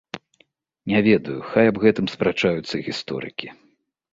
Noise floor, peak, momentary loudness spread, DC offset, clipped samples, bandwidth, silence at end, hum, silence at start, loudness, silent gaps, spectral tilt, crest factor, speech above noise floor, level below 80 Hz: -62 dBFS; -2 dBFS; 18 LU; under 0.1%; under 0.1%; 7.8 kHz; 0.6 s; none; 0.15 s; -21 LUFS; none; -6.5 dB/octave; 20 dB; 42 dB; -56 dBFS